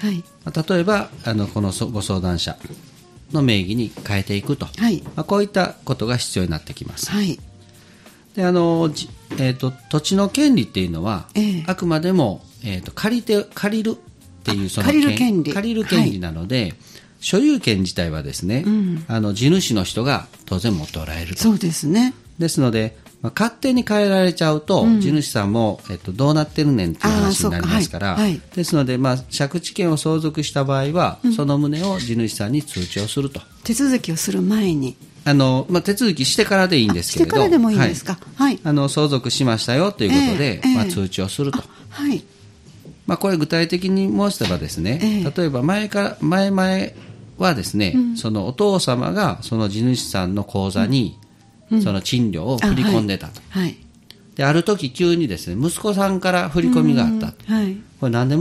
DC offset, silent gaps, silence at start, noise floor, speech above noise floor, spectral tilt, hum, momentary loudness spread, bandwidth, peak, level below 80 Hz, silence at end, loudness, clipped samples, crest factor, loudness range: under 0.1%; none; 0 s; -47 dBFS; 28 dB; -5.5 dB/octave; none; 9 LU; 15.5 kHz; 0 dBFS; -46 dBFS; 0 s; -19 LUFS; under 0.1%; 20 dB; 4 LU